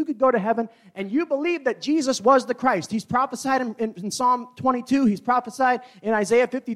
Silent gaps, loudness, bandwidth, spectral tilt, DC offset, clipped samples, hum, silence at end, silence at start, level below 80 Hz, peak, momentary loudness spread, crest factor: none; -22 LUFS; 14 kHz; -4.5 dB/octave; under 0.1%; under 0.1%; none; 0 s; 0 s; -66 dBFS; -6 dBFS; 8 LU; 16 dB